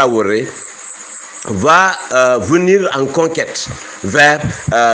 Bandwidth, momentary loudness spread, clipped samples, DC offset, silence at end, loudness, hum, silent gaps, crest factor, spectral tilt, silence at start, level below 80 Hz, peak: 10 kHz; 18 LU; 0.1%; under 0.1%; 0 s; -13 LUFS; none; none; 14 dB; -4 dB/octave; 0 s; -46 dBFS; 0 dBFS